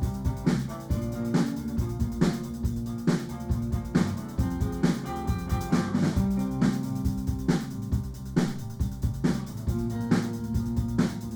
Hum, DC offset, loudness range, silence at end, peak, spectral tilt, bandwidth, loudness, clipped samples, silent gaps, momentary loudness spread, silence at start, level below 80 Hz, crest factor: none; under 0.1%; 2 LU; 0 s; -10 dBFS; -7 dB/octave; over 20 kHz; -29 LUFS; under 0.1%; none; 5 LU; 0 s; -36 dBFS; 18 dB